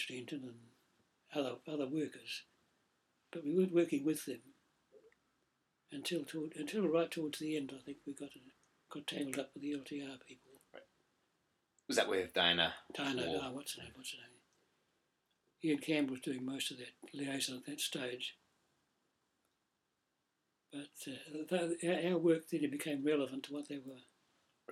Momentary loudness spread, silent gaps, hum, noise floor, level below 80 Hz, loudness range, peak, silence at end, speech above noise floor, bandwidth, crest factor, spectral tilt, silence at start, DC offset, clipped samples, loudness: 17 LU; none; none; -85 dBFS; -80 dBFS; 9 LU; -16 dBFS; 0 s; 46 dB; 16 kHz; 24 dB; -4 dB/octave; 0 s; under 0.1%; under 0.1%; -39 LUFS